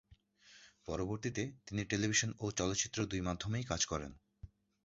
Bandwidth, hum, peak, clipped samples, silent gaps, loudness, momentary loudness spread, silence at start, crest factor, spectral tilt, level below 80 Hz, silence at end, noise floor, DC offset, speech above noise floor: 7.6 kHz; none; -18 dBFS; under 0.1%; none; -37 LUFS; 11 LU; 0.1 s; 22 dB; -4.5 dB/octave; -56 dBFS; 0.35 s; -65 dBFS; under 0.1%; 27 dB